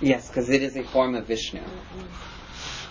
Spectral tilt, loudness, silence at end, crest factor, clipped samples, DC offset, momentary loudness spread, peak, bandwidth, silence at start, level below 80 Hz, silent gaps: -5 dB/octave; -26 LUFS; 0 s; 20 dB; under 0.1%; under 0.1%; 16 LU; -6 dBFS; 7.6 kHz; 0 s; -46 dBFS; none